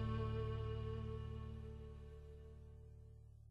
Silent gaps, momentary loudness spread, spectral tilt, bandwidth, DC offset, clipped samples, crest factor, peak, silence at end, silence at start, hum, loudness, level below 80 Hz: none; 17 LU; -8.5 dB/octave; 5.6 kHz; under 0.1%; under 0.1%; 16 dB; -32 dBFS; 0 s; 0 s; none; -48 LUFS; -52 dBFS